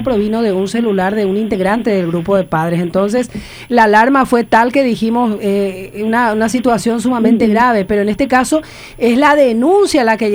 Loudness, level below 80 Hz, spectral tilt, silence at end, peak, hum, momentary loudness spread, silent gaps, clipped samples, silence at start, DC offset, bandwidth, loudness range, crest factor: -13 LUFS; -42 dBFS; -5.5 dB/octave; 0 s; 0 dBFS; none; 7 LU; none; under 0.1%; 0 s; under 0.1%; over 20 kHz; 3 LU; 12 dB